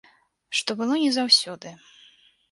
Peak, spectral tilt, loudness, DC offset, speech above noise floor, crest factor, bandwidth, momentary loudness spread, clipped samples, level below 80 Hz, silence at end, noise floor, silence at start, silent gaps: -4 dBFS; -2 dB/octave; -21 LUFS; under 0.1%; 33 dB; 22 dB; 11.5 kHz; 20 LU; under 0.1%; -76 dBFS; 0.75 s; -57 dBFS; 0.5 s; none